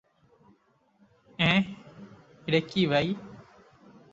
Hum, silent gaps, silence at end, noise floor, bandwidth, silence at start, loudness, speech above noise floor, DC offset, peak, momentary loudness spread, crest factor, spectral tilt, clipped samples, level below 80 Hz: none; none; 0.7 s; -66 dBFS; 7.8 kHz; 1.4 s; -27 LUFS; 41 dB; under 0.1%; -8 dBFS; 25 LU; 22 dB; -6.5 dB/octave; under 0.1%; -62 dBFS